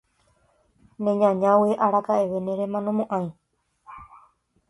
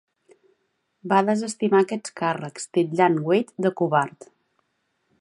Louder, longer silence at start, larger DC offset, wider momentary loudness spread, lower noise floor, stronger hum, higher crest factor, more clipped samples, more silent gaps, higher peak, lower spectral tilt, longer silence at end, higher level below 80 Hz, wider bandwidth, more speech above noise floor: about the same, -23 LUFS vs -23 LUFS; about the same, 1 s vs 1.05 s; neither; first, 18 LU vs 7 LU; second, -65 dBFS vs -73 dBFS; neither; about the same, 18 dB vs 20 dB; neither; neither; about the same, -6 dBFS vs -4 dBFS; first, -8.5 dB/octave vs -6 dB/octave; second, 0.55 s vs 1.1 s; first, -66 dBFS vs -76 dBFS; about the same, 11.5 kHz vs 11.5 kHz; second, 43 dB vs 51 dB